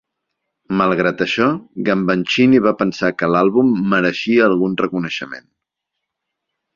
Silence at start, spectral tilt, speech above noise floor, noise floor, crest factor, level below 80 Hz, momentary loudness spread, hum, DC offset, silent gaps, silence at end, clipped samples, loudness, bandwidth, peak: 0.7 s; -6.5 dB/octave; 63 dB; -79 dBFS; 16 dB; -56 dBFS; 9 LU; none; under 0.1%; none; 1.35 s; under 0.1%; -16 LUFS; 7.4 kHz; -2 dBFS